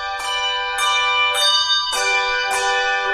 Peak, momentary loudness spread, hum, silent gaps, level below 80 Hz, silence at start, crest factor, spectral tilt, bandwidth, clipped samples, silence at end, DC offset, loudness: -4 dBFS; 6 LU; none; none; -48 dBFS; 0 s; 14 dB; 2 dB/octave; 15.5 kHz; under 0.1%; 0 s; under 0.1%; -17 LUFS